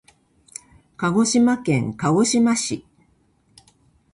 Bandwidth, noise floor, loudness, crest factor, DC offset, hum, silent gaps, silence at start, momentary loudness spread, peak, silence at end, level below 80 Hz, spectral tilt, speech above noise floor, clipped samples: 11.5 kHz; -61 dBFS; -19 LUFS; 14 dB; under 0.1%; none; none; 1 s; 22 LU; -8 dBFS; 1.35 s; -58 dBFS; -4.5 dB/octave; 42 dB; under 0.1%